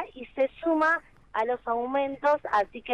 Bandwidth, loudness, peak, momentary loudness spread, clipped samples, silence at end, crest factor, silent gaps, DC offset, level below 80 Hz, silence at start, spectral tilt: 10 kHz; -27 LUFS; -12 dBFS; 6 LU; under 0.1%; 0 s; 14 dB; none; under 0.1%; -60 dBFS; 0 s; -5 dB/octave